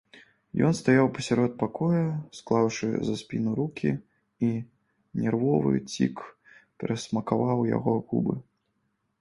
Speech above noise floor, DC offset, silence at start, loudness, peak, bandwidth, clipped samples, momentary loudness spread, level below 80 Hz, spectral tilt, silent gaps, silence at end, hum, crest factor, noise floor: 49 dB; under 0.1%; 0.15 s; -27 LUFS; -8 dBFS; 11.5 kHz; under 0.1%; 12 LU; -60 dBFS; -7 dB/octave; none; 0.8 s; none; 20 dB; -75 dBFS